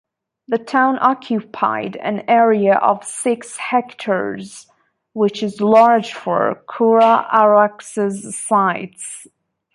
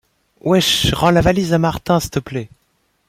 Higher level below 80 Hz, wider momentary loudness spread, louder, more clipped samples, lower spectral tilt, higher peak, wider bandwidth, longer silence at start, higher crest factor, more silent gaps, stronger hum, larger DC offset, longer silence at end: second, -66 dBFS vs -36 dBFS; about the same, 14 LU vs 12 LU; about the same, -16 LUFS vs -16 LUFS; neither; about the same, -5 dB/octave vs -5 dB/octave; about the same, -2 dBFS vs -2 dBFS; second, 11.5 kHz vs 16 kHz; about the same, 0.5 s vs 0.45 s; about the same, 16 dB vs 16 dB; neither; neither; neither; about the same, 0.5 s vs 0.6 s